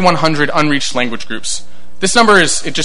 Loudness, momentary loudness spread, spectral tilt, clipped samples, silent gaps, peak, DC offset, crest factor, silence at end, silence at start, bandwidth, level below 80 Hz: -13 LUFS; 13 LU; -3 dB/octave; 0.3%; none; 0 dBFS; 10%; 14 dB; 0 s; 0 s; 12.5 kHz; -42 dBFS